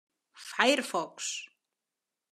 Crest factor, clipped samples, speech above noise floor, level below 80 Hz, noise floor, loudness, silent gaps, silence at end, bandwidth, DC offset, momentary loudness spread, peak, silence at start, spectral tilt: 24 dB; under 0.1%; 58 dB; under -90 dBFS; -89 dBFS; -30 LUFS; none; 0.85 s; 14.5 kHz; under 0.1%; 20 LU; -10 dBFS; 0.35 s; -1.5 dB/octave